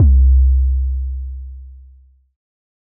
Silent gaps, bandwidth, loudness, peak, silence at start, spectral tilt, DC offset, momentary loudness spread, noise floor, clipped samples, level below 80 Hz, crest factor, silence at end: none; 0.5 kHz; -16 LUFS; -6 dBFS; 0 s; -17.5 dB/octave; under 0.1%; 22 LU; -47 dBFS; under 0.1%; -16 dBFS; 10 dB; 1.25 s